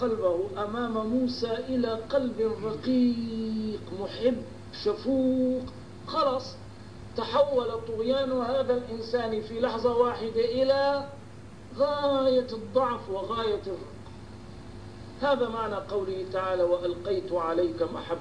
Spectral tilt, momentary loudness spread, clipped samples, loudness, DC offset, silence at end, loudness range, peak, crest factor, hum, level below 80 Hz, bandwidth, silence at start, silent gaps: -6.5 dB/octave; 18 LU; under 0.1%; -28 LUFS; 0.3%; 0 s; 4 LU; -12 dBFS; 16 dB; none; -54 dBFS; 10.5 kHz; 0 s; none